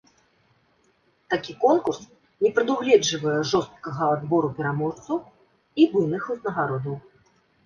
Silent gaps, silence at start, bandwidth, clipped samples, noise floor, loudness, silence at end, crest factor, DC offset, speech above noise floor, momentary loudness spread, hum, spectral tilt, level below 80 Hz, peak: none; 1.3 s; 7.2 kHz; under 0.1%; -65 dBFS; -24 LUFS; 0.65 s; 20 dB; under 0.1%; 42 dB; 11 LU; none; -5 dB/octave; -64 dBFS; -4 dBFS